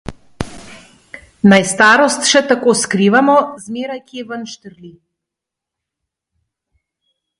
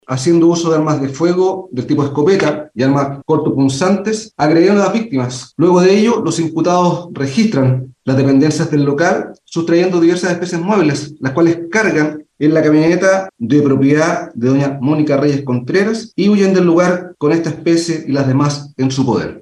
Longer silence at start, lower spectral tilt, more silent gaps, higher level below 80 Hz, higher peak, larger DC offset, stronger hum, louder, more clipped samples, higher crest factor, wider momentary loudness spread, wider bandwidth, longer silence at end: about the same, 0.1 s vs 0.1 s; second, -4 dB/octave vs -6.5 dB/octave; neither; first, -48 dBFS vs -54 dBFS; about the same, 0 dBFS vs 0 dBFS; neither; neither; about the same, -12 LUFS vs -14 LUFS; neither; about the same, 16 dB vs 12 dB; first, 19 LU vs 7 LU; about the same, 11.5 kHz vs 11 kHz; first, 2.5 s vs 0 s